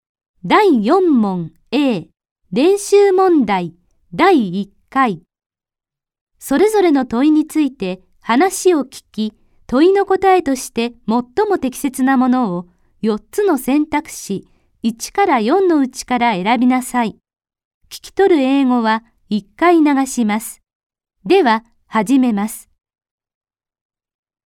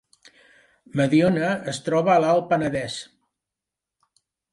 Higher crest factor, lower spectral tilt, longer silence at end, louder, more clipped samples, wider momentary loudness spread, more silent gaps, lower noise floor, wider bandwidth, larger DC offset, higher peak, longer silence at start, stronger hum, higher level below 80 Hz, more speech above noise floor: about the same, 16 dB vs 16 dB; about the same, -5 dB/octave vs -6 dB/octave; first, 1.85 s vs 1.5 s; first, -16 LUFS vs -22 LUFS; neither; about the same, 13 LU vs 12 LU; first, 2.31-2.36 s, 5.46-5.50 s, 6.21-6.27 s, 17.65-17.81 s, 20.75-20.90 s vs none; about the same, -87 dBFS vs -87 dBFS; first, 17 kHz vs 11.5 kHz; neither; first, 0 dBFS vs -8 dBFS; second, 0.45 s vs 0.95 s; neither; first, -52 dBFS vs -60 dBFS; first, 73 dB vs 66 dB